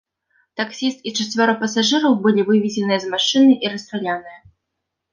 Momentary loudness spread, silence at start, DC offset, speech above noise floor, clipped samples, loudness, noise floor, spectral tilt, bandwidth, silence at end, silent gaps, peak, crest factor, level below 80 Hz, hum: 12 LU; 0.6 s; under 0.1%; 61 dB; under 0.1%; -18 LUFS; -79 dBFS; -4 dB/octave; 9.8 kHz; 0.75 s; none; -2 dBFS; 16 dB; -66 dBFS; none